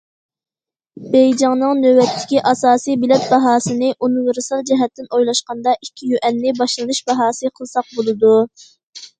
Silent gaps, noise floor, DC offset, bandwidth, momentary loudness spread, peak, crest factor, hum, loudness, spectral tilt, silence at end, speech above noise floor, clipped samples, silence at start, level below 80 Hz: 8.83-8.93 s; -86 dBFS; under 0.1%; 9.4 kHz; 8 LU; 0 dBFS; 16 dB; none; -16 LUFS; -4 dB/octave; 0.15 s; 71 dB; under 0.1%; 0.95 s; -62 dBFS